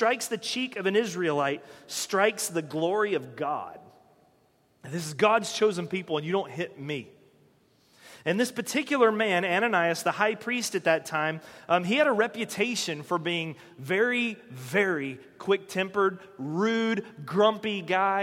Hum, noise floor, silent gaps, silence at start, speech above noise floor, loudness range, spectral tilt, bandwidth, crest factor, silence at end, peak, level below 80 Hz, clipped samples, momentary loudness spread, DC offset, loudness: none; -65 dBFS; none; 0 s; 38 dB; 4 LU; -4 dB/octave; 16.5 kHz; 20 dB; 0 s; -8 dBFS; -76 dBFS; under 0.1%; 11 LU; under 0.1%; -27 LUFS